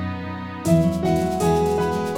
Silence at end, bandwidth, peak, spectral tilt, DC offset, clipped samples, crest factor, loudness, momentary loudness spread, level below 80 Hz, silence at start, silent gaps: 0 s; 17 kHz; -6 dBFS; -7 dB/octave; under 0.1%; under 0.1%; 16 dB; -21 LUFS; 10 LU; -40 dBFS; 0 s; none